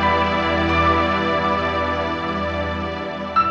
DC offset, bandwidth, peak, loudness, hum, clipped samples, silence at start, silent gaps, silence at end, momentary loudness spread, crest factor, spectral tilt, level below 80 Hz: under 0.1%; 8.2 kHz; -6 dBFS; -20 LUFS; none; under 0.1%; 0 s; none; 0 s; 7 LU; 14 dB; -6.5 dB/octave; -36 dBFS